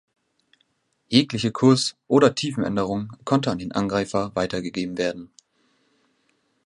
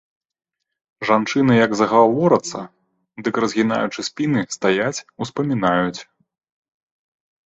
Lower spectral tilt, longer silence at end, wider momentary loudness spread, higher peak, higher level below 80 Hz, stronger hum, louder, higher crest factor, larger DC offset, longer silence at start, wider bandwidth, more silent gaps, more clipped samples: about the same, -5.5 dB/octave vs -5.5 dB/octave; about the same, 1.4 s vs 1.45 s; second, 9 LU vs 14 LU; about the same, -2 dBFS vs -2 dBFS; about the same, -56 dBFS vs -60 dBFS; neither; second, -22 LUFS vs -19 LUFS; about the same, 22 dB vs 18 dB; neither; about the same, 1.1 s vs 1 s; first, 11.5 kHz vs 8.2 kHz; neither; neither